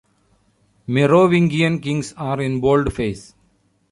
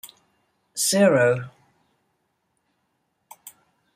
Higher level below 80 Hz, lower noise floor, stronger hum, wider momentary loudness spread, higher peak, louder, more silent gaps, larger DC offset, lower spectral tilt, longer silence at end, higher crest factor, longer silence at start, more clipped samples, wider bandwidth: first, -42 dBFS vs -70 dBFS; second, -61 dBFS vs -73 dBFS; neither; second, 12 LU vs 19 LU; first, -2 dBFS vs -6 dBFS; about the same, -18 LUFS vs -20 LUFS; neither; neither; first, -7 dB/octave vs -4 dB/octave; first, 0.7 s vs 0.45 s; about the same, 16 dB vs 20 dB; first, 0.9 s vs 0.05 s; neither; second, 11.5 kHz vs 16 kHz